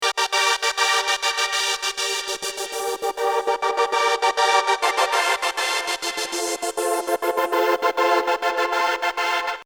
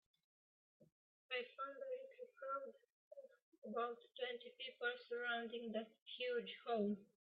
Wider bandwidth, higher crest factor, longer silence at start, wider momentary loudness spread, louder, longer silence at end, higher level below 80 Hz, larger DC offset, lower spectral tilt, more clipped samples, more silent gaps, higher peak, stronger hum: first, over 20 kHz vs 5 kHz; about the same, 16 dB vs 18 dB; second, 0 s vs 0.8 s; second, 6 LU vs 15 LU; first, -21 LUFS vs -47 LUFS; second, 0 s vs 0.2 s; first, -64 dBFS vs under -90 dBFS; neither; second, 1 dB/octave vs -2 dB/octave; neither; second, none vs 0.92-1.29 s, 2.92-3.11 s, 3.42-3.52 s, 3.58-3.62 s, 6.02-6.06 s; first, -6 dBFS vs -30 dBFS; neither